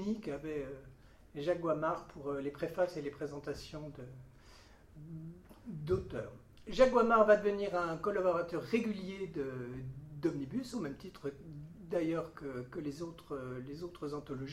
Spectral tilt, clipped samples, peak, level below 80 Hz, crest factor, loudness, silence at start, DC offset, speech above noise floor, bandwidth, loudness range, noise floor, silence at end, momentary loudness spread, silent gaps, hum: -6.5 dB/octave; under 0.1%; -14 dBFS; -60 dBFS; 22 dB; -36 LUFS; 0 s; under 0.1%; 23 dB; 14.5 kHz; 11 LU; -59 dBFS; 0 s; 20 LU; none; none